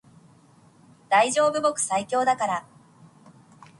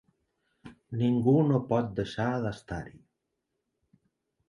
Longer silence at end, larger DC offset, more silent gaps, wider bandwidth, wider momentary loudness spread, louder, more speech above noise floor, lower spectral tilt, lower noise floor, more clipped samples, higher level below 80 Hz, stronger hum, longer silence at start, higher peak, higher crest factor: second, 1.2 s vs 1.6 s; neither; neither; about the same, 11.5 kHz vs 11 kHz; second, 6 LU vs 16 LU; first, -23 LUFS vs -28 LUFS; second, 33 dB vs 55 dB; second, -2.5 dB/octave vs -8.5 dB/octave; second, -55 dBFS vs -82 dBFS; neither; second, -72 dBFS vs -58 dBFS; neither; first, 1.1 s vs 0.65 s; first, -8 dBFS vs -12 dBFS; about the same, 18 dB vs 20 dB